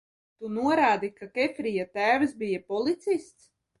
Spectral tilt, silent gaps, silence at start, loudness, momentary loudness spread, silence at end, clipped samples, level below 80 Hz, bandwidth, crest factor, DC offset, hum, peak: -5.5 dB/octave; none; 0.4 s; -27 LUFS; 9 LU; 0.55 s; under 0.1%; -68 dBFS; 11.5 kHz; 18 dB; under 0.1%; none; -10 dBFS